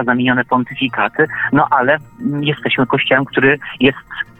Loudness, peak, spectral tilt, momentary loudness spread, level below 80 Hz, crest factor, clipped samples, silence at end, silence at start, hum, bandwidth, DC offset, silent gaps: -15 LUFS; 0 dBFS; -8 dB/octave; 5 LU; -50 dBFS; 14 dB; under 0.1%; 0.15 s; 0 s; none; 4.1 kHz; under 0.1%; none